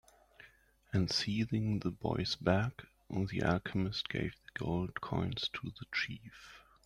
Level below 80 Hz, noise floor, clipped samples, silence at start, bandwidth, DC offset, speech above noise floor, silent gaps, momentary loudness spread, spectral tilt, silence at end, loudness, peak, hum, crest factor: -58 dBFS; -64 dBFS; under 0.1%; 0.4 s; 13 kHz; under 0.1%; 28 dB; none; 10 LU; -6 dB/octave; 0.25 s; -36 LUFS; -16 dBFS; none; 20 dB